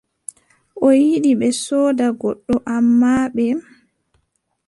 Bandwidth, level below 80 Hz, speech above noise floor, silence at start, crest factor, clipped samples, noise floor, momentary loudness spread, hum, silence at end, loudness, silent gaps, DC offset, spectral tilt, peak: 11.5 kHz; -52 dBFS; 53 dB; 0.75 s; 14 dB; under 0.1%; -69 dBFS; 12 LU; none; 1.05 s; -17 LUFS; none; under 0.1%; -5 dB/octave; -4 dBFS